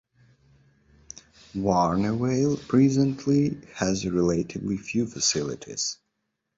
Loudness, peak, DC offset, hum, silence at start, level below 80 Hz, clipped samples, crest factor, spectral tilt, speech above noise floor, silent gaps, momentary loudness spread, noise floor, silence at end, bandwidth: -25 LUFS; -8 dBFS; under 0.1%; none; 1.55 s; -52 dBFS; under 0.1%; 18 dB; -5 dB/octave; 55 dB; none; 16 LU; -79 dBFS; 0.65 s; 8 kHz